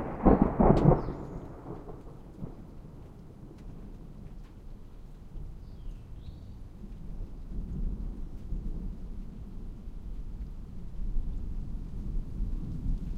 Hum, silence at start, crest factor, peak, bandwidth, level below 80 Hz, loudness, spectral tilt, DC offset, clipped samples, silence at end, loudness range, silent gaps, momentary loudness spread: none; 0 s; 26 dB; -8 dBFS; 5.4 kHz; -36 dBFS; -32 LUFS; -10 dB/octave; under 0.1%; under 0.1%; 0 s; 17 LU; none; 24 LU